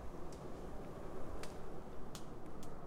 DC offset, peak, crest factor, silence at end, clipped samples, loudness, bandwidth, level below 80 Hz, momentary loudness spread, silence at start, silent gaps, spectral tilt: under 0.1%; -30 dBFS; 12 dB; 0 s; under 0.1%; -51 LUFS; 14.5 kHz; -54 dBFS; 3 LU; 0 s; none; -5.5 dB/octave